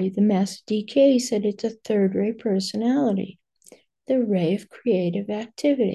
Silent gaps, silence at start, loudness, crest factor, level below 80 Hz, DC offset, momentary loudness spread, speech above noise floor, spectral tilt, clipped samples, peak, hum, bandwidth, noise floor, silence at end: none; 0 s; -23 LUFS; 16 dB; -68 dBFS; under 0.1%; 9 LU; 31 dB; -6.5 dB/octave; under 0.1%; -8 dBFS; none; 12.5 kHz; -53 dBFS; 0 s